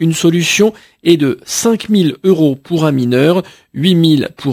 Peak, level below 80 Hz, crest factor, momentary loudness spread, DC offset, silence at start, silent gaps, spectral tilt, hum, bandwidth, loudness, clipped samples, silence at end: 0 dBFS; -54 dBFS; 12 dB; 4 LU; under 0.1%; 0 s; none; -5 dB/octave; none; 16 kHz; -13 LUFS; under 0.1%; 0 s